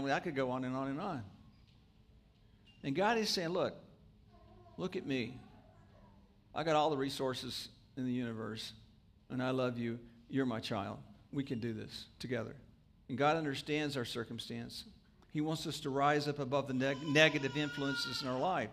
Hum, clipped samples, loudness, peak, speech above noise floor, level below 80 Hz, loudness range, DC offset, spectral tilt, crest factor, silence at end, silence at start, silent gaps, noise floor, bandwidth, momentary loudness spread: none; under 0.1%; -37 LUFS; -12 dBFS; 28 dB; -68 dBFS; 6 LU; under 0.1%; -5 dB/octave; 26 dB; 0 s; 0 s; none; -65 dBFS; 15.5 kHz; 14 LU